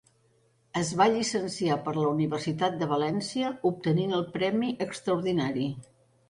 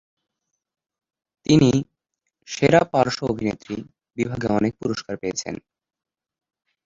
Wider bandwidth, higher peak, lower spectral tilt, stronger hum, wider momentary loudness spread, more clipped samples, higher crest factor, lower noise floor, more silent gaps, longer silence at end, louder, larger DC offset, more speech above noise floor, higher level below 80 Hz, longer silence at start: first, 11.5 kHz vs 7.8 kHz; second, -10 dBFS vs -2 dBFS; about the same, -5.5 dB/octave vs -6 dB/octave; neither; second, 7 LU vs 17 LU; neither; about the same, 18 dB vs 22 dB; second, -66 dBFS vs -79 dBFS; neither; second, 0.45 s vs 1.3 s; second, -28 LUFS vs -22 LUFS; neither; second, 39 dB vs 58 dB; second, -64 dBFS vs -52 dBFS; second, 0.75 s vs 1.5 s